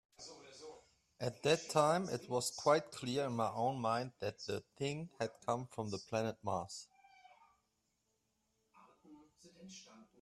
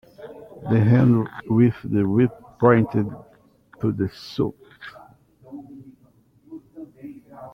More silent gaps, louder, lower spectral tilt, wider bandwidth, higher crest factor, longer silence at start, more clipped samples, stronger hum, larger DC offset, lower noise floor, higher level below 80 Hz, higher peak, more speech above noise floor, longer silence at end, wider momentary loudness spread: neither; second, -38 LUFS vs -21 LUFS; second, -4.5 dB/octave vs -9.5 dB/octave; first, 14 kHz vs 6.2 kHz; about the same, 24 dB vs 20 dB; about the same, 0.2 s vs 0.2 s; neither; neither; neither; first, -83 dBFS vs -57 dBFS; second, -76 dBFS vs -54 dBFS; second, -16 dBFS vs -2 dBFS; first, 45 dB vs 38 dB; first, 0.2 s vs 0.05 s; second, 21 LU vs 25 LU